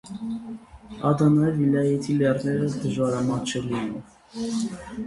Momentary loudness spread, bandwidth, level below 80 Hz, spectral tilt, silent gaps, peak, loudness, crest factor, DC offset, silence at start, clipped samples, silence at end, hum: 16 LU; 11.5 kHz; -54 dBFS; -7 dB/octave; none; -8 dBFS; -24 LUFS; 16 dB; under 0.1%; 0.05 s; under 0.1%; 0 s; none